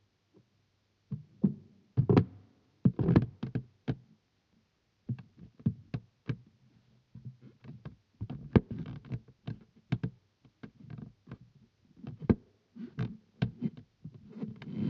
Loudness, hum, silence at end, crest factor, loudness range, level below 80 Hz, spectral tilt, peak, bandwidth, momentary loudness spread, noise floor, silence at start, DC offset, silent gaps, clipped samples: -34 LUFS; none; 0 s; 28 dB; 11 LU; -54 dBFS; -9 dB/octave; -8 dBFS; 6 kHz; 24 LU; -74 dBFS; 1.1 s; under 0.1%; none; under 0.1%